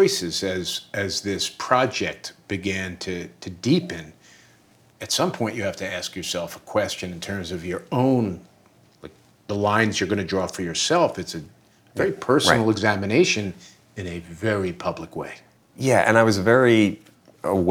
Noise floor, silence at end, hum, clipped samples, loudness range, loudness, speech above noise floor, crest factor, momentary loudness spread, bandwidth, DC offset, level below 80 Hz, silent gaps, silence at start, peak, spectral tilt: -56 dBFS; 0 s; none; under 0.1%; 6 LU; -23 LUFS; 34 dB; 22 dB; 16 LU; 19 kHz; under 0.1%; -56 dBFS; none; 0 s; 0 dBFS; -4.5 dB/octave